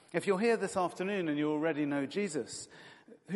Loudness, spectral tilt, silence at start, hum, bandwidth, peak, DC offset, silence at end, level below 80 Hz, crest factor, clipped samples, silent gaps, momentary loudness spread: -33 LUFS; -5 dB/octave; 0.15 s; none; 11.5 kHz; -16 dBFS; under 0.1%; 0 s; -78 dBFS; 18 dB; under 0.1%; none; 10 LU